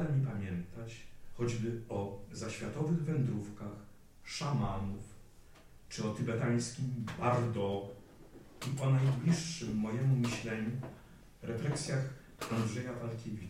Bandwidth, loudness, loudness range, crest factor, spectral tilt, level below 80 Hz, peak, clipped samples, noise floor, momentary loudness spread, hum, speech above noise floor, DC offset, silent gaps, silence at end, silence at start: 14 kHz; -36 LUFS; 4 LU; 18 dB; -6.5 dB/octave; -58 dBFS; -18 dBFS; under 0.1%; -57 dBFS; 16 LU; none; 22 dB; under 0.1%; none; 0 s; 0 s